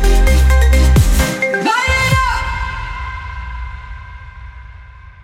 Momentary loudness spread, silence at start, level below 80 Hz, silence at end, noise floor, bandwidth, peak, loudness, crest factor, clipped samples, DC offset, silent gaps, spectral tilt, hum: 22 LU; 0 s; -16 dBFS; 0.1 s; -36 dBFS; 16.5 kHz; 0 dBFS; -14 LUFS; 14 dB; under 0.1%; under 0.1%; none; -5 dB/octave; none